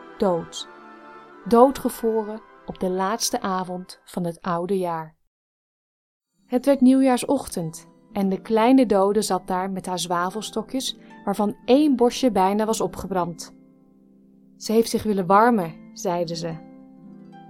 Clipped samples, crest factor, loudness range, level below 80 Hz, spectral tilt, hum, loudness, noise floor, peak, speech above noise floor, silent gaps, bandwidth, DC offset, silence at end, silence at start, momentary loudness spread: under 0.1%; 22 dB; 6 LU; -54 dBFS; -5 dB/octave; none; -22 LUFS; -54 dBFS; -2 dBFS; 32 dB; 5.27-6.20 s; 16.5 kHz; under 0.1%; 0.05 s; 0 s; 17 LU